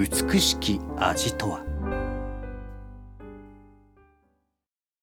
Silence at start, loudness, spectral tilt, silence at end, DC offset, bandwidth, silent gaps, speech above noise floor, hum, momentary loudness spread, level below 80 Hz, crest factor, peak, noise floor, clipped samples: 0 s; -26 LUFS; -3.5 dB/octave; 1.35 s; under 0.1%; over 20 kHz; none; 63 dB; none; 24 LU; -38 dBFS; 22 dB; -8 dBFS; -88 dBFS; under 0.1%